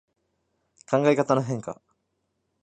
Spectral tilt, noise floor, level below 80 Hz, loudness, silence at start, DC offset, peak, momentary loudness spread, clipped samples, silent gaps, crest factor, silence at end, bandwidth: -6.5 dB/octave; -76 dBFS; -70 dBFS; -24 LUFS; 0.9 s; under 0.1%; -6 dBFS; 17 LU; under 0.1%; none; 22 dB; 0.9 s; 9.2 kHz